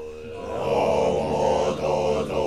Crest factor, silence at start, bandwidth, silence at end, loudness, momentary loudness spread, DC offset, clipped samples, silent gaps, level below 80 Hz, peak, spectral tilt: 14 dB; 0 s; 12.5 kHz; 0 s; -23 LUFS; 11 LU; 0.3%; under 0.1%; none; -44 dBFS; -10 dBFS; -5.5 dB/octave